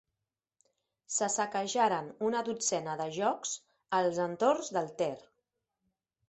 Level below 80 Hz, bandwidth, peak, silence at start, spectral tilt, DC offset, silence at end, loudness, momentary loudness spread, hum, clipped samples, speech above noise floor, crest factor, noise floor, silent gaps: -78 dBFS; 8.6 kHz; -14 dBFS; 1.1 s; -3 dB/octave; under 0.1%; 1.1 s; -32 LUFS; 7 LU; none; under 0.1%; 58 dB; 20 dB; -89 dBFS; none